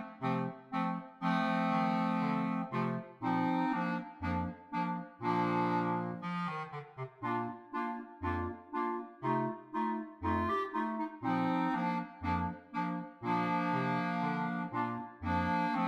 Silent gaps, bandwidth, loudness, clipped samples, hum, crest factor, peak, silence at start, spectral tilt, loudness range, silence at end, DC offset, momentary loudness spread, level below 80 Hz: none; 7.6 kHz; -35 LUFS; under 0.1%; none; 14 dB; -20 dBFS; 0 s; -8 dB/octave; 4 LU; 0 s; under 0.1%; 7 LU; -66 dBFS